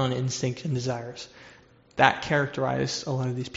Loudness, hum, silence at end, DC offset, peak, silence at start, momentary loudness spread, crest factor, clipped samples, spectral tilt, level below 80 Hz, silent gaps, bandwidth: -26 LUFS; none; 0 s; under 0.1%; -2 dBFS; 0 s; 16 LU; 26 dB; under 0.1%; -4 dB/octave; -60 dBFS; none; 8 kHz